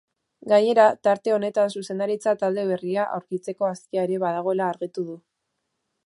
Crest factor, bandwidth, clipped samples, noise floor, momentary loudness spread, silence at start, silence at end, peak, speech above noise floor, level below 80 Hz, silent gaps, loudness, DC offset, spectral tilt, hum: 20 dB; 11.5 kHz; under 0.1%; -78 dBFS; 13 LU; 0.45 s; 0.9 s; -4 dBFS; 55 dB; -76 dBFS; none; -23 LUFS; under 0.1%; -6 dB/octave; none